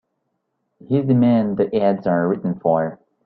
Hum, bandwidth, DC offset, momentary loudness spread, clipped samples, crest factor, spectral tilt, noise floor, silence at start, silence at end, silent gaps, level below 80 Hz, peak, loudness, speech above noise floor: none; 4.7 kHz; under 0.1%; 6 LU; under 0.1%; 16 dB; -12 dB/octave; -73 dBFS; 0.9 s; 0.3 s; none; -60 dBFS; -4 dBFS; -19 LUFS; 55 dB